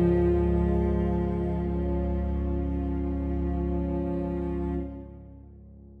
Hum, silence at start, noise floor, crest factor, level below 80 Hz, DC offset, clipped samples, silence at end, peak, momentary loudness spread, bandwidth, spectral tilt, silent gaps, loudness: none; 0 s; -48 dBFS; 16 dB; -32 dBFS; under 0.1%; under 0.1%; 0 s; -12 dBFS; 9 LU; 3.7 kHz; -11 dB/octave; none; -28 LUFS